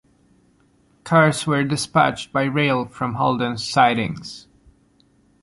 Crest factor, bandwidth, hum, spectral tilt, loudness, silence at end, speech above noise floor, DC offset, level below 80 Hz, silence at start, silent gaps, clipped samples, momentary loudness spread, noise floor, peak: 18 dB; 11.5 kHz; none; -5 dB/octave; -19 LUFS; 1.05 s; 39 dB; under 0.1%; -56 dBFS; 1.05 s; none; under 0.1%; 11 LU; -59 dBFS; -2 dBFS